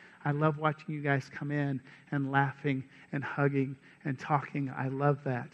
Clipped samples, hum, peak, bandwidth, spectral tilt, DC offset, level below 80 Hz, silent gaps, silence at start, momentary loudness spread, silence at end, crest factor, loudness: under 0.1%; none; -10 dBFS; 6.8 kHz; -8.5 dB/octave; under 0.1%; -72 dBFS; none; 0 s; 9 LU; 0.05 s; 22 dB; -33 LUFS